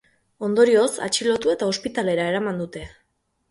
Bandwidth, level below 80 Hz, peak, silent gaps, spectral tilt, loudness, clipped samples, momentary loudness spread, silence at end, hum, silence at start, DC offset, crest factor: 11.5 kHz; -56 dBFS; -4 dBFS; none; -4 dB/octave; -21 LUFS; under 0.1%; 14 LU; 0.65 s; none; 0.4 s; under 0.1%; 18 dB